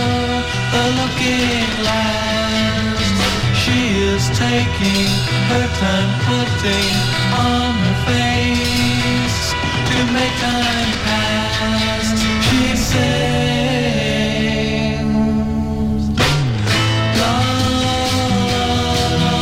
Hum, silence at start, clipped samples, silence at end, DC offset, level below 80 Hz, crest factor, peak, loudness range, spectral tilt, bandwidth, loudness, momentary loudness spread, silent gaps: none; 0 s; under 0.1%; 0 s; under 0.1%; -30 dBFS; 12 dB; -4 dBFS; 1 LU; -4.5 dB/octave; 16.5 kHz; -16 LUFS; 2 LU; none